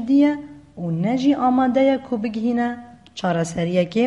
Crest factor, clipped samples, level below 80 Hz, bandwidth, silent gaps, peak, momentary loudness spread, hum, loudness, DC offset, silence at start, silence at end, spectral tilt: 14 dB; under 0.1%; -56 dBFS; 11.5 kHz; none; -6 dBFS; 14 LU; none; -20 LUFS; under 0.1%; 0 s; 0 s; -7 dB/octave